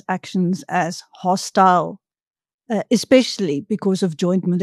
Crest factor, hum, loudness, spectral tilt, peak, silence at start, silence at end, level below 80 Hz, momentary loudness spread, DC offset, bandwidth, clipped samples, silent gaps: 18 dB; none; -19 LUFS; -5.5 dB/octave; -2 dBFS; 0.1 s; 0 s; -66 dBFS; 11 LU; under 0.1%; 13 kHz; under 0.1%; 2.27-2.34 s, 2.54-2.59 s